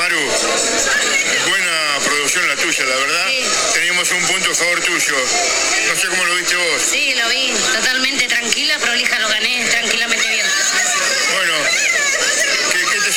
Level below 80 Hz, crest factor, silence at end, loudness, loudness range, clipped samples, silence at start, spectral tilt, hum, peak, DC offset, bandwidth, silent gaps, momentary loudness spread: -50 dBFS; 16 dB; 0 s; -14 LUFS; 0 LU; under 0.1%; 0 s; 0.5 dB/octave; none; 0 dBFS; under 0.1%; 18 kHz; none; 1 LU